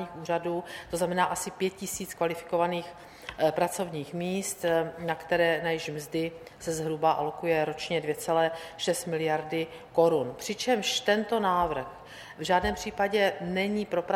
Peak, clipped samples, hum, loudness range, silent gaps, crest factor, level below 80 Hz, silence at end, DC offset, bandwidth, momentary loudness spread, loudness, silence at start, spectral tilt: -10 dBFS; under 0.1%; none; 3 LU; none; 18 dB; -56 dBFS; 0 s; under 0.1%; 16 kHz; 9 LU; -29 LUFS; 0 s; -4 dB/octave